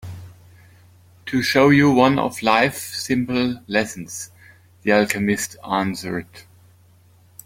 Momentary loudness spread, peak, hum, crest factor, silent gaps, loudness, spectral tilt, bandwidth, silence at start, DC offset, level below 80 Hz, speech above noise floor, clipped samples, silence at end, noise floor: 18 LU; -2 dBFS; none; 20 dB; none; -19 LUFS; -5 dB/octave; 16.5 kHz; 0.05 s; under 0.1%; -56 dBFS; 33 dB; under 0.1%; 1.05 s; -53 dBFS